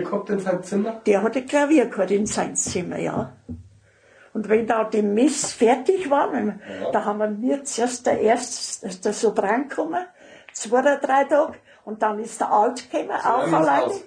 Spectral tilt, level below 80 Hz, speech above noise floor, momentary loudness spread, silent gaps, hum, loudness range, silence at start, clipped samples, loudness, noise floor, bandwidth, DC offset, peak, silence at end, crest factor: -4 dB/octave; -62 dBFS; 33 dB; 11 LU; none; none; 2 LU; 0 s; under 0.1%; -22 LUFS; -54 dBFS; 10 kHz; under 0.1%; -6 dBFS; 0 s; 16 dB